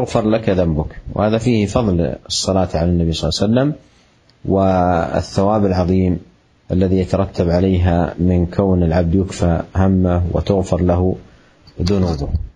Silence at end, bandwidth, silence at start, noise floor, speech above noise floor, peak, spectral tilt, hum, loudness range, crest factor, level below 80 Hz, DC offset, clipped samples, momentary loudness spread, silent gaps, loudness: 0.05 s; 10.5 kHz; 0 s; -52 dBFS; 37 dB; 0 dBFS; -7 dB/octave; none; 2 LU; 16 dB; -32 dBFS; under 0.1%; under 0.1%; 5 LU; none; -17 LUFS